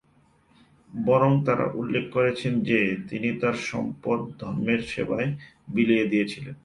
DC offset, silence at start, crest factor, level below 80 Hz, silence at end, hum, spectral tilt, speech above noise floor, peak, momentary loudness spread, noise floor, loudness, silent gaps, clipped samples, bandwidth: under 0.1%; 0.9 s; 18 dB; -58 dBFS; 0.1 s; none; -7 dB/octave; 36 dB; -8 dBFS; 9 LU; -61 dBFS; -25 LUFS; none; under 0.1%; 11 kHz